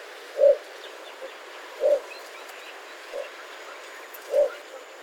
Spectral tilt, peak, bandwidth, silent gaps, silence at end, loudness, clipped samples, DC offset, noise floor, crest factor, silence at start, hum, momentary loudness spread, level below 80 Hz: 0.5 dB/octave; -8 dBFS; 17.5 kHz; none; 0 s; -25 LUFS; under 0.1%; under 0.1%; -42 dBFS; 20 dB; 0 s; none; 19 LU; -76 dBFS